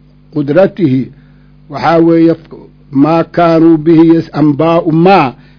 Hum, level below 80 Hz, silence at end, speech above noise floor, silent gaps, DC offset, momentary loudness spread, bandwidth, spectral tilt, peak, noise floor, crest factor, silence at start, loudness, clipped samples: none; -44 dBFS; 0.25 s; 32 dB; none; under 0.1%; 11 LU; 5.4 kHz; -9.5 dB/octave; 0 dBFS; -40 dBFS; 10 dB; 0.35 s; -9 LUFS; 2%